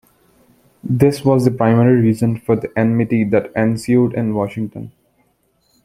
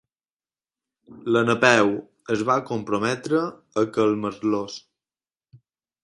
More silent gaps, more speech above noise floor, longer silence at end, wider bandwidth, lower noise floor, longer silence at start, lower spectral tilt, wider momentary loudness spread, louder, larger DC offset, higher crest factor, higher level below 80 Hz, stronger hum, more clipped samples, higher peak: neither; second, 47 dB vs over 68 dB; second, 0.95 s vs 1.25 s; first, 14.5 kHz vs 11.5 kHz; second, -62 dBFS vs under -90 dBFS; second, 0.85 s vs 1.1 s; first, -8.5 dB/octave vs -5 dB/octave; about the same, 12 LU vs 12 LU; first, -16 LUFS vs -22 LUFS; neither; second, 16 dB vs 24 dB; first, -50 dBFS vs -64 dBFS; neither; neither; about the same, 0 dBFS vs 0 dBFS